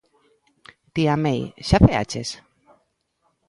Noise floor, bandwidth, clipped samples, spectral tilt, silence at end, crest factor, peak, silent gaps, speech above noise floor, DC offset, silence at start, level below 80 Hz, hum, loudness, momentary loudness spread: -70 dBFS; 11.5 kHz; under 0.1%; -6.5 dB/octave; 1.15 s; 22 dB; 0 dBFS; none; 50 dB; under 0.1%; 0.95 s; -36 dBFS; none; -21 LUFS; 15 LU